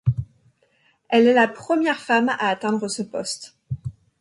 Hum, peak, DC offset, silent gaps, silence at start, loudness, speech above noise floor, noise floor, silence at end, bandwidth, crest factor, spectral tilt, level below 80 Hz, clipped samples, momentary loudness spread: none; -6 dBFS; under 0.1%; none; 0.05 s; -21 LUFS; 43 dB; -63 dBFS; 0.3 s; 11.5 kHz; 18 dB; -5.5 dB/octave; -50 dBFS; under 0.1%; 16 LU